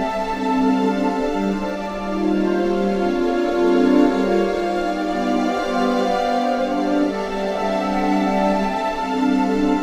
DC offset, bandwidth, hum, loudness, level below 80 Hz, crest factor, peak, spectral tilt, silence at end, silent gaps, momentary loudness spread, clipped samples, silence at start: under 0.1%; 13.5 kHz; none; -20 LUFS; -40 dBFS; 16 dB; -4 dBFS; -6.5 dB/octave; 0 s; none; 5 LU; under 0.1%; 0 s